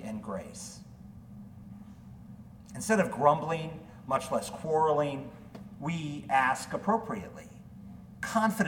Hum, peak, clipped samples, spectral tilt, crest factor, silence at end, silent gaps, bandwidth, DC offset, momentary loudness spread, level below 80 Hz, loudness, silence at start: none; -10 dBFS; under 0.1%; -5.5 dB/octave; 22 dB; 0 s; none; 18 kHz; under 0.1%; 23 LU; -60 dBFS; -30 LUFS; 0 s